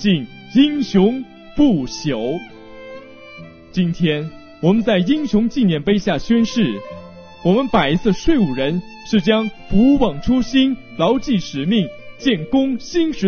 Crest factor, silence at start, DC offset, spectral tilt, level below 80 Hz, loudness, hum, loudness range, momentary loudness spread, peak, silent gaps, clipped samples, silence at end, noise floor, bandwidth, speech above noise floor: 16 dB; 0 s; under 0.1%; -5.5 dB/octave; -36 dBFS; -18 LUFS; none; 4 LU; 15 LU; -2 dBFS; none; under 0.1%; 0 s; -38 dBFS; 6.8 kHz; 22 dB